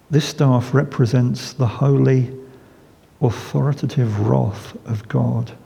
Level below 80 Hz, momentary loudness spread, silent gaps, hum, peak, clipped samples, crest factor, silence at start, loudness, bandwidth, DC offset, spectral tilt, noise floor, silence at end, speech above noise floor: -54 dBFS; 10 LU; none; none; -2 dBFS; under 0.1%; 18 dB; 0.1 s; -19 LUFS; 12 kHz; under 0.1%; -7.5 dB/octave; -49 dBFS; 0.1 s; 31 dB